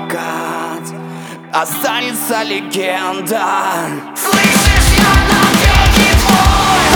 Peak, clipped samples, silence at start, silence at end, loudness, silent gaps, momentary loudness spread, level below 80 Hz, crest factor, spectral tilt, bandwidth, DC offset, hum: 0 dBFS; under 0.1%; 0 s; 0 s; -12 LUFS; none; 13 LU; -18 dBFS; 12 dB; -3.5 dB/octave; over 20 kHz; under 0.1%; none